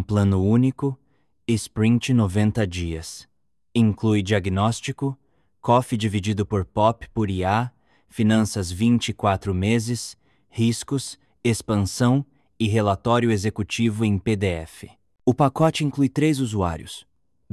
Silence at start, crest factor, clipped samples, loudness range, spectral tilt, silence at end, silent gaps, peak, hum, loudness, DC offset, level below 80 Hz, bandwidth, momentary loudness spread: 0 s; 18 dB; under 0.1%; 2 LU; -6 dB/octave; 0.5 s; none; -4 dBFS; none; -22 LUFS; under 0.1%; -42 dBFS; 13 kHz; 12 LU